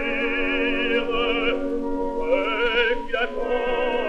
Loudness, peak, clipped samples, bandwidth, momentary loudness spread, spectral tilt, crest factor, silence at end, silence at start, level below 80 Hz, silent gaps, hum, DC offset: -23 LUFS; -8 dBFS; under 0.1%; 7.8 kHz; 5 LU; -5 dB/octave; 14 dB; 0 s; 0 s; -36 dBFS; none; none; under 0.1%